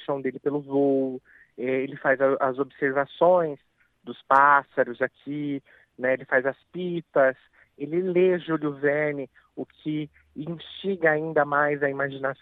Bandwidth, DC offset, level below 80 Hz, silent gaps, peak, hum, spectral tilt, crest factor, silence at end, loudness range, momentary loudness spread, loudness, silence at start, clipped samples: 4.6 kHz; under 0.1%; -72 dBFS; none; -4 dBFS; none; -9 dB/octave; 20 dB; 0.1 s; 4 LU; 15 LU; -25 LUFS; 0 s; under 0.1%